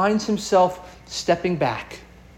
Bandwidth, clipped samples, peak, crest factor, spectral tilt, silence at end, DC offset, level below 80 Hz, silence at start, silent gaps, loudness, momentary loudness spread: 16.5 kHz; under 0.1%; -6 dBFS; 16 dB; -5 dB/octave; 0.35 s; under 0.1%; -50 dBFS; 0 s; none; -22 LUFS; 20 LU